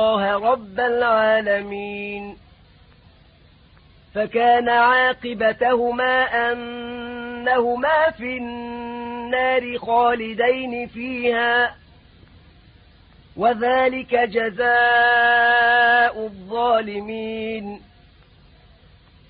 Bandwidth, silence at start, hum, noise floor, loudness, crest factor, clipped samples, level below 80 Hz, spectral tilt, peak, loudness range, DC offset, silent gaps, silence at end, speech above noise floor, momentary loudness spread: 5 kHz; 0 s; none; -52 dBFS; -19 LUFS; 16 dB; under 0.1%; -54 dBFS; -8.5 dB/octave; -6 dBFS; 7 LU; under 0.1%; none; 1.5 s; 32 dB; 16 LU